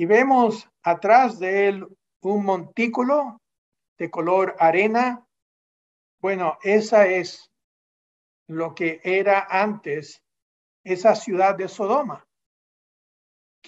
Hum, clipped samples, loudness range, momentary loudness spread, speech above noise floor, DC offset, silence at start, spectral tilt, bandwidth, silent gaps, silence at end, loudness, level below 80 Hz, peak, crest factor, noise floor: none; under 0.1%; 4 LU; 15 LU; over 69 dB; under 0.1%; 0 s; -5.5 dB/octave; 8 kHz; 2.16-2.20 s, 3.58-3.72 s, 3.88-3.96 s, 5.42-6.18 s, 7.64-8.46 s, 10.42-10.84 s; 1.5 s; -21 LUFS; -78 dBFS; -2 dBFS; 20 dB; under -90 dBFS